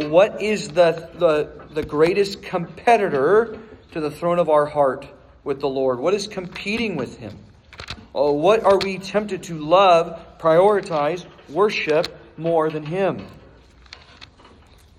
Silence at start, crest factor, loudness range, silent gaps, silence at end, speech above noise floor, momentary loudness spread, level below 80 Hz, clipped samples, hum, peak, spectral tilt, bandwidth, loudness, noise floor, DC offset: 0 s; 18 dB; 6 LU; none; 0.75 s; 30 dB; 14 LU; -52 dBFS; under 0.1%; none; -4 dBFS; -5.5 dB/octave; 13 kHz; -20 LUFS; -49 dBFS; under 0.1%